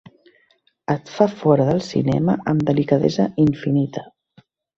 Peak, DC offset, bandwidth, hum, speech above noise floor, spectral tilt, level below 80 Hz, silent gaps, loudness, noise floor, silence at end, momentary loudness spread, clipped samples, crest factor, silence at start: -2 dBFS; under 0.1%; 7.6 kHz; none; 43 dB; -8 dB/octave; -52 dBFS; none; -19 LUFS; -62 dBFS; 0.75 s; 8 LU; under 0.1%; 18 dB; 0.9 s